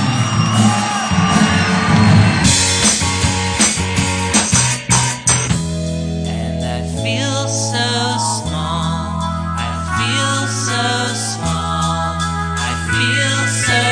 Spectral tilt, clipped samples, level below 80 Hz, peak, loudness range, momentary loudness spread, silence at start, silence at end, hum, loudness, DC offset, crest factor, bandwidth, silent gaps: -3.5 dB/octave; under 0.1%; -32 dBFS; 0 dBFS; 6 LU; 9 LU; 0 s; 0 s; none; -15 LUFS; under 0.1%; 16 dB; 10.5 kHz; none